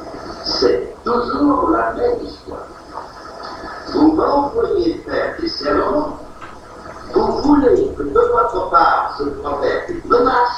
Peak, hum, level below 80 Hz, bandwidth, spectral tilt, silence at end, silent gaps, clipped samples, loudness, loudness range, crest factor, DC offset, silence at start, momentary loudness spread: 0 dBFS; none; -38 dBFS; 9.6 kHz; -6 dB/octave; 0 s; none; under 0.1%; -17 LUFS; 4 LU; 16 dB; under 0.1%; 0 s; 19 LU